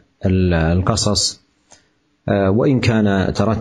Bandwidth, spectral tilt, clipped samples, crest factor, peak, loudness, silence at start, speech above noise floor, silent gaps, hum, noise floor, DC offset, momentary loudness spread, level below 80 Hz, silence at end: 12 kHz; -5.5 dB/octave; under 0.1%; 16 dB; -2 dBFS; -17 LUFS; 0.2 s; 44 dB; none; none; -59 dBFS; under 0.1%; 5 LU; -36 dBFS; 0 s